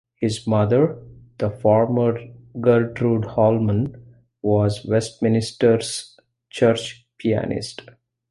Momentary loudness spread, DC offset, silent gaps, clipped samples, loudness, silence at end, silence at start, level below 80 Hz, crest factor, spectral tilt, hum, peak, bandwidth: 12 LU; under 0.1%; none; under 0.1%; -21 LUFS; 0.5 s; 0.2 s; -50 dBFS; 18 dB; -6.5 dB/octave; none; -4 dBFS; 11.5 kHz